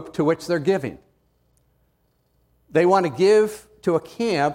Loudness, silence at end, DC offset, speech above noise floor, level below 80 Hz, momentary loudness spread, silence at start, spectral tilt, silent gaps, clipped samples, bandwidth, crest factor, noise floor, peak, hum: -21 LUFS; 0 s; under 0.1%; 46 dB; -60 dBFS; 9 LU; 0 s; -6 dB/octave; none; under 0.1%; 16 kHz; 18 dB; -66 dBFS; -4 dBFS; none